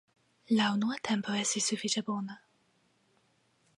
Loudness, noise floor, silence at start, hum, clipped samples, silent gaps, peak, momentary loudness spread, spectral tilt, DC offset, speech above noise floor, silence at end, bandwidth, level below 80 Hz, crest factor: -31 LUFS; -71 dBFS; 0.5 s; none; under 0.1%; none; -18 dBFS; 9 LU; -3 dB/octave; under 0.1%; 40 dB; 1.4 s; 11.5 kHz; -78 dBFS; 16 dB